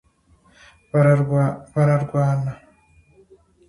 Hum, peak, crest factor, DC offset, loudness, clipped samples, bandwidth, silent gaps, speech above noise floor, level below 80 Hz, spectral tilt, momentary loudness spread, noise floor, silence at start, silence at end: none; -4 dBFS; 18 dB; under 0.1%; -20 LUFS; under 0.1%; 11 kHz; none; 39 dB; -54 dBFS; -9.5 dB/octave; 9 LU; -57 dBFS; 0.95 s; 1.15 s